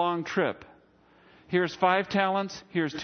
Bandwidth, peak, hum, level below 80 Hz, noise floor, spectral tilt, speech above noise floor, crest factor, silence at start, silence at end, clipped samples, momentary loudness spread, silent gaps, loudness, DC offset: 6.6 kHz; -8 dBFS; none; -68 dBFS; -60 dBFS; -5.5 dB/octave; 32 dB; 20 dB; 0 s; 0 s; under 0.1%; 7 LU; none; -27 LUFS; under 0.1%